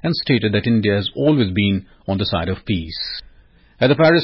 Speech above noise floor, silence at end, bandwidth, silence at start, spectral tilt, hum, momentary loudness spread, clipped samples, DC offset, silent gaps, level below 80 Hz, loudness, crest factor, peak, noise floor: 32 dB; 0 s; 5.8 kHz; 0.05 s; -11 dB/octave; none; 9 LU; under 0.1%; under 0.1%; none; -38 dBFS; -19 LUFS; 14 dB; -4 dBFS; -50 dBFS